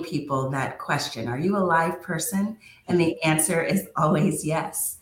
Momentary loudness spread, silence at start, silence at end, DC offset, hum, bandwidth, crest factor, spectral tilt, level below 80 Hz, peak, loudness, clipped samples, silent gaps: 7 LU; 0 s; 0.05 s; under 0.1%; none; 17 kHz; 16 dB; -4.5 dB/octave; -60 dBFS; -8 dBFS; -24 LUFS; under 0.1%; none